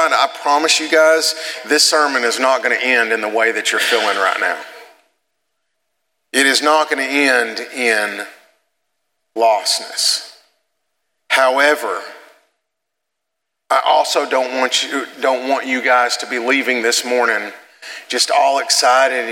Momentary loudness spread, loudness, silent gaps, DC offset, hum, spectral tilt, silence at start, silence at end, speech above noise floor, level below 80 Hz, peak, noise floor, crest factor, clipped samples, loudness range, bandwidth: 10 LU; -15 LUFS; none; under 0.1%; none; 0.5 dB/octave; 0 s; 0 s; 62 dB; -80 dBFS; 0 dBFS; -78 dBFS; 18 dB; under 0.1%; 5 LU; 17 kHz